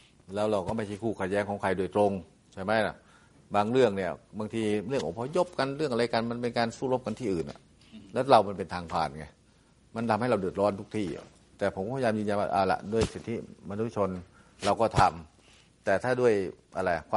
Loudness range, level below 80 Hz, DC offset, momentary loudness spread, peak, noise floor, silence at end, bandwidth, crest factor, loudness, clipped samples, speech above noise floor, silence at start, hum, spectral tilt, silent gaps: 2 LU; -56 dBFS; under 0.1%; 12 LU; -6 dBFS; -61 dBFS; 0 s; 11.5 kHz; 24 dB; -29 LUFS; under 0.1%; 33 dB; 0.3 s; none; -6 dB/octave; none